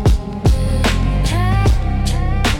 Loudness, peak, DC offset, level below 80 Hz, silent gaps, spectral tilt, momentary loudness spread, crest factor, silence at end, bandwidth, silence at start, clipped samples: -17 LUFS; -4 dBFS; under 0.1%; -18 dBFS; none; -6 dB/octave; 3 LU; 12 dB; 0 s; 16.5 kHz; 0 s; under 0.1%